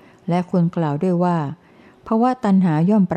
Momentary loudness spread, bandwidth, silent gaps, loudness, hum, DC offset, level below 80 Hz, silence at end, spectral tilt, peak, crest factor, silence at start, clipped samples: 7 LU; 8.6 kHz; none; -19 LUFS; none; under 0.1%; -58 dBFS; 0 s; -9.5 dB/octave; -6 dBFS; 12 dB; 0.25 s; under 0.1%